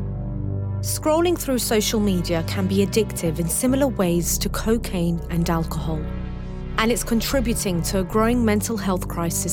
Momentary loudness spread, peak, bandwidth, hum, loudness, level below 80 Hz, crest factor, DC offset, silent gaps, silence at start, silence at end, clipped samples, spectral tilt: 8 LU; -4 dBFS; 18 kHz; none; -22 LUFS; -32 dBFS; 18 dB; under 0.1%; none; 0 s; 0 s; under 0.1%; -5 dB/octave